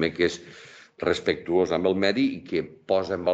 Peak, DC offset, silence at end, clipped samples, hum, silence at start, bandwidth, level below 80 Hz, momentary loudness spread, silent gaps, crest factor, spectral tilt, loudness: -8 dBFS; under 0.1%; 0 s; under 0.1%; none; 0 s; 8.2 kHz; -58 dBFS; 9 LU; none; 18 dB; -5.5 dB/octave; -25 LUFS